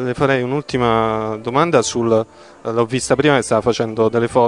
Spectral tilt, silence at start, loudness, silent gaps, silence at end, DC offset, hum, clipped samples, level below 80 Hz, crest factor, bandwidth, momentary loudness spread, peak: -5 dB/octave; 0 s; -17 LUFS; none; 0 s; 0.1%; none; under 0.1%; -48 dBFS; 16 dB; 11 kHz; 6 LU; 0 dBFS